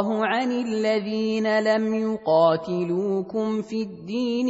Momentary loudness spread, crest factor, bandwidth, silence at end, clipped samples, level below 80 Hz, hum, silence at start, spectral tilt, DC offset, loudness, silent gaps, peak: 8 LU; 16 dB; 8 kHz; 0 s; under 0.1%; -66 dBFS; none; 0 s; -6.5 dB/octave; under 0.1%; -24 LUFS; none; -8 dBFS